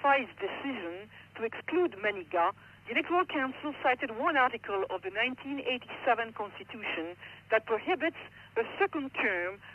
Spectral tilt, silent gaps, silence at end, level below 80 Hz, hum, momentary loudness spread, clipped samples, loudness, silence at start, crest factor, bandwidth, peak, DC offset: -6 dB/octave; none; 0 s; -72 dBFS; none; 10 LU; under 0.1%; -32 LUFS; 0 s; 18 dB; 6.8 kHz; -14 dBFS; under 0.1%